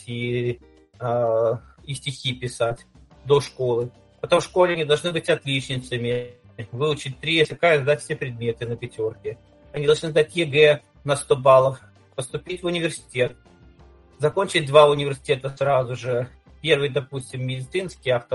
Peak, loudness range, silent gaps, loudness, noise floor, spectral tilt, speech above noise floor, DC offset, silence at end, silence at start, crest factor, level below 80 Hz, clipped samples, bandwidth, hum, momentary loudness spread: 0 dBFS; 4 LU; none; -22 LUFS; -51 dBFS; -5 dB/octave; 29 dB; under 0.1%; 0 s; 0.05 s; 22 dB; -54 dBFS; under 0.1%; 11.5 kHz; none; 15 LU